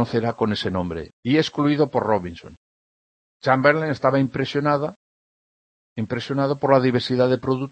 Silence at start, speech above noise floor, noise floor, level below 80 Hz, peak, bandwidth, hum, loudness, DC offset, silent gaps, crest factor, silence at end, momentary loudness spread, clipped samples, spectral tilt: 0 s; over 69 dB; under -90 dBFS; -56 dBFS; -2 dBFS; 8.8 kHz; none; -21 LUFS; under 0.1%; 1.13-1.23 s, 2.57-3.40 s, 4.96-5.96 s; 20 dB; 0 s; 12 LU; under 0.1%; -7 dB/octave